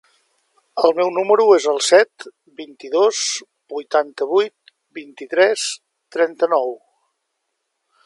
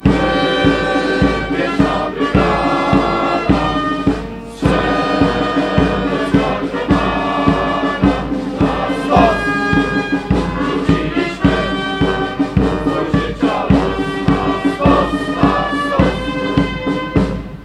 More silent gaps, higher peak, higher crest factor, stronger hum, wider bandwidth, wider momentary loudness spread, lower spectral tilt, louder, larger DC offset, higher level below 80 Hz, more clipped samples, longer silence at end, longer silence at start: neither; about the same, 0 dBFS vs 0 dBFS; about the same, 20 dB vs 16 dB; neither; about the same, 11.5 kHz vs 11 kHz; first, 23 LU vs 4 LU; second, -1.5 dB/octave vs -7 dB/octave; about the same, -17 LUFS vs -15 LUFS; neither; second, -76 dBFS vs -28 dBFS; neither; first, 1.3 s vs 0 s; first, 0.75 s vs 0 s